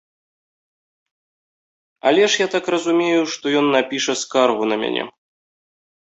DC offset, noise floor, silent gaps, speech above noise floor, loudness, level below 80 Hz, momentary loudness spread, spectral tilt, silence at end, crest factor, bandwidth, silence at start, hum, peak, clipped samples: under 0.1%; under -90 dBFS; none; over 72 dB; -18 LUFS; -68 dBFS; 6 LU; -3 dB/octave; 1 s; 18 dB; 8.2 kHz; 2.05 s; none; -2 dBFS; under 0.1%